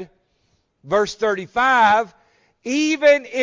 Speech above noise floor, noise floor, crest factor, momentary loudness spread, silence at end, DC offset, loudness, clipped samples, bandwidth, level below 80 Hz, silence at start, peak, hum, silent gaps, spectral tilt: 48 dB; -66 dBFS; 16 dB; 10 LU; 0 s; under 0.1%; -18 LUFS; under 0.1%; 7.6 kHz; -58 dBFS; 0 s; -4 dBFS; none; none; -3.5 dB/octave